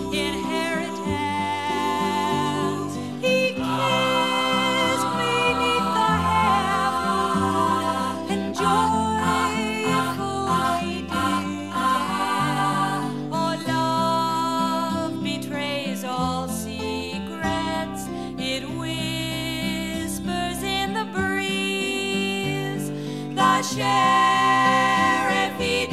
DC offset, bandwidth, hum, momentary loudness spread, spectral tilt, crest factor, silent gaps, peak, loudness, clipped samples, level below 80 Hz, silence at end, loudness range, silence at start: 0.3%; 16 kHz; none; 8 LU; -4 dB/octave; 18 dB; none; -6 dBFS; -23 LUFS; under 0.1%; -48 dBFS; 0 s; 6 LU; 0 s